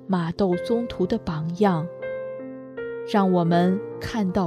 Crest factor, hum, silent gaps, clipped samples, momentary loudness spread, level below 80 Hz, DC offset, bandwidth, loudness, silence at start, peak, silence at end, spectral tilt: 18 dB; none; none; under 0.1%; 13 LU; -52 dBFS; under 0.1%; 10.5 kHz; -24 LUFS; 0 s; -6 dBFS; 0 s; -8 dB/octave